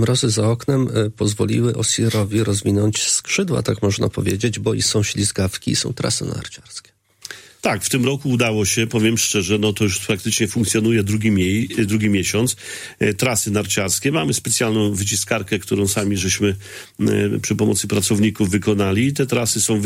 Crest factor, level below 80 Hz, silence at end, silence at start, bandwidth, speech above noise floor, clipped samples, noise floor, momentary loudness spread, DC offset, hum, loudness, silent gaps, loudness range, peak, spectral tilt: 16 dB; -48 dBFS; 0 s; 0 s; 16.5 kHz; 20 dB; under 0.1%; -39 dBFS; 5 LU; under 0.1%; none; -19 LUFS; none; 3 LU; -2 dBFS; -4 dB/octave